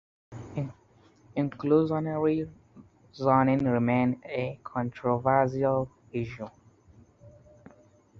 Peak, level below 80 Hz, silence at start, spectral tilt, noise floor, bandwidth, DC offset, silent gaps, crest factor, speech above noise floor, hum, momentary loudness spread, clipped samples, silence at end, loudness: -8 dBFS; -60 dBFS; 0.3 s; -9 dB/octave; -60 dBFS; 7.2 kHz; under 0.1%; none; 20 dB; 33 dB; none; 15 LU; under 0.1%; 0.9 s; -28 LUFS